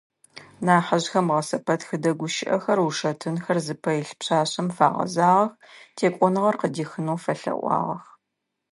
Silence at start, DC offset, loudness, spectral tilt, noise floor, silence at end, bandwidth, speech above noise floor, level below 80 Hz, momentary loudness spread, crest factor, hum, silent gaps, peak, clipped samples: 0.35 s; under 0.1%; -24 LUFS; -5.5 dB/octave; -81 dBFS; 0.7 s; 11.5 kHz; 57 dB; -72 dBFS; 8 LU; 22 dB; none; none; -2 dBFS; under 0.1%